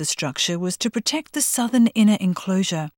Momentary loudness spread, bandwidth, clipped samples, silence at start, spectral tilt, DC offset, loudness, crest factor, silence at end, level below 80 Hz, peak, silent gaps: 7 LU; 19 kHz; under 0.1%; 0 s; -4 dB/octave; under 0.1%; -20 LUFS; 14 dB; 0.1 s; -66 dBFS; -8 dBFS; none